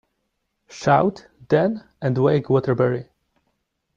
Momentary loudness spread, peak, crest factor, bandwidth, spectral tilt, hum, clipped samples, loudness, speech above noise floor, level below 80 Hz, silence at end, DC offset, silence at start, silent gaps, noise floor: 8 LU; -4 dBFS; 18 dB; 7.6 kHz; -7.5 dB/octave; none; under 0.1%; -21 LUFS; 55 dB; -58 dBFS; 0.95 s; under 0.1%; 0.7 s; none; -74 dBFS